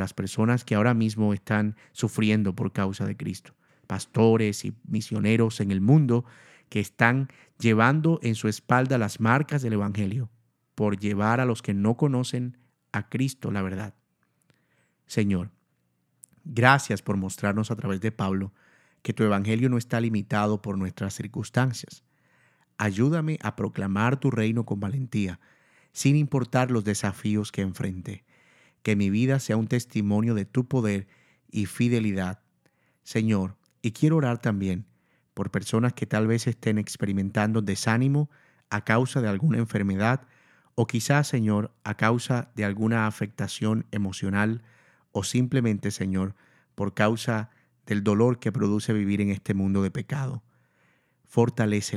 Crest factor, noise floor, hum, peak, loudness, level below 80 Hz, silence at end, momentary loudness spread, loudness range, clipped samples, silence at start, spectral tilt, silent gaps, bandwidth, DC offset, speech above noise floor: 26 dB; -72 dBFS; none; 0 dBFS; -26 LUFS; -64 dBFS; 0 s; 11 LU; 4 LU; under 0.1%; 0 s; -6.5 dB/octave; none; 14 kHz; under 0.1%; 47 dB